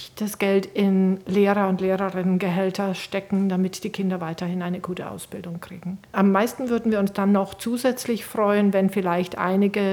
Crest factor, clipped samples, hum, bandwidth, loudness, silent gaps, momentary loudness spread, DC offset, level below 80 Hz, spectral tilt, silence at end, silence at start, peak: 18 dB; under 0.1%; none; 18 kHz; -23 LUFS; none; 11 LU; under 0.1%; -60 dBFS; -6.5 dB/octave; 0 s; 0 s; -6 dBFS